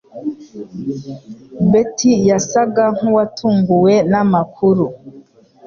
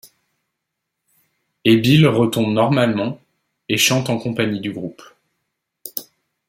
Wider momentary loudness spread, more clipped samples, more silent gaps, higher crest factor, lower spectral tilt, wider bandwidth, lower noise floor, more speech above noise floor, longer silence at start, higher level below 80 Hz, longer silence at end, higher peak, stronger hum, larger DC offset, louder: about the same, 17 LU vs 17 LU; neither; neither; second, 12 dB vs 18 dB; first, -6.5 dB/octave vs -5 dB/octave; second, 7.4 kHz vs 16.5 kHz; second, -43 dBFS vs -79 dBFS; second, 28 dB vs 62 dB; second, 0.15 s vs 1.65 s; about the same, -52 dBFS vs -56 dBFS; about the same, 0.45 s vs 0.45 s; about the same, -2 dBFS vs -2 dBFS; neither; neither; first, -14 LUFS vs -17 LUFS